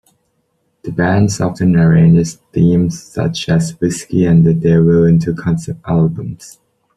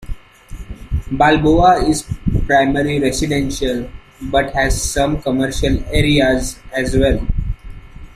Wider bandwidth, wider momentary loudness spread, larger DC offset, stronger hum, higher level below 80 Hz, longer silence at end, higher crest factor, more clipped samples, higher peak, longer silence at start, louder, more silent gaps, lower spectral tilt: second, 11 kHz vs 15 kHz; second, 10 LU vs 18 LU; neither; neither; second, -42 dBFS vs -24 dBFS; first, 0.45 s vs 0 s; about the same, 12 dB vs 16 dB; neither; about the same, -2 dBFS vs -2 dBFS; first, 0.85 s vs 0 s; first, -13 LUFS vs -16 LUFS; neither; first, -7 dB/octave vs -5 dB/octave